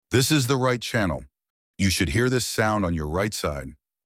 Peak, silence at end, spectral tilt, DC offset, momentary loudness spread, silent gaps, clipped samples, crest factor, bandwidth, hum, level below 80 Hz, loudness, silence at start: -6 dBFS; 0.3 s; -4.5 dB/octave; under 0.1%; 9 LU; 1.50-1.74 s; under 0.1%; 18 dB; 16.5 kHz; none; -42 dBFS; -23 LUFS; 0.1 s